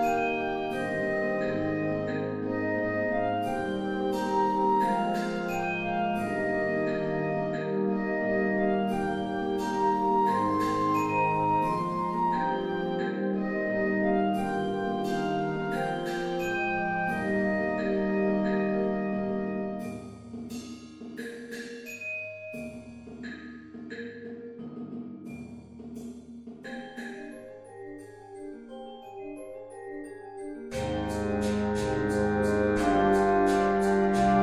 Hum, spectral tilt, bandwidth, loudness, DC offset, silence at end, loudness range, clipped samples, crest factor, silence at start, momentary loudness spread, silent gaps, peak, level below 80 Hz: none; -6.5 dB/octave; 13.5 kHz; -28 LUFS; under 0.1%; 0 s; 15 LU; under 0.1%; 18 dB; 0 s; 18 LU; none; -10 dBFS; -52 dBFS